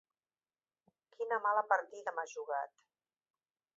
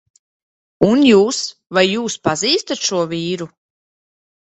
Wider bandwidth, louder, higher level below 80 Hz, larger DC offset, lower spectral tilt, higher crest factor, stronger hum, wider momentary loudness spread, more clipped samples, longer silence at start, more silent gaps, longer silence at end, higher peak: second, 7.6 kHz vs 8.4 kHz; second, -36 LUFS vs -16 LUFS; second, under -90 dBFS vs -54 dBFS; neither; second, 0.5 dB/octave vs -4 dB/octave; first, 24 dB vs 18 dB; neither; about the same, 11 LU vs 12 LU; neither; first, 1.2 s vs 0.8 s; neither; first, 1.1 s vs 0.95 s; second, -16 dBFS vs 0 dBFS